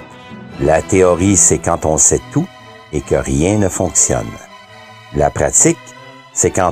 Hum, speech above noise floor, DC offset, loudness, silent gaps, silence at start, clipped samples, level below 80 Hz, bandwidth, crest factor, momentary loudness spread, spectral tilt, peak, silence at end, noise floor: none; 24 dB; under 0.1%; -13 LUFS; none; 0 s; under 0.1%; -34 dBFS; 16 kHz; 16 dB; 15 LU; -4.5 dB/octave; 0 dBFS; 0 s; -38 dBFS